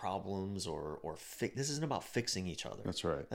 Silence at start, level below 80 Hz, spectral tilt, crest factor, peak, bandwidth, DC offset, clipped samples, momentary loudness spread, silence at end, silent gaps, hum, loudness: 0 s; -62 dBFS; -4 dB/octave; 16 dB; -22 dBFS; 16.5 kHz; under 0.1%; under 0.1%; 6 LU; 0 s; none; none; -39 LUFS